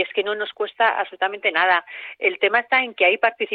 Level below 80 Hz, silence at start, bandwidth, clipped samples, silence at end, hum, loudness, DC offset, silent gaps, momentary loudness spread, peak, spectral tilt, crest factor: -70 dBFS; 0 s; 5 kHz; under 0.1%; 0 s; none; -20 LUFS; under 0.1%; none; 8 LU; -4 dBFS; -5.5 dB/octave; 16 dB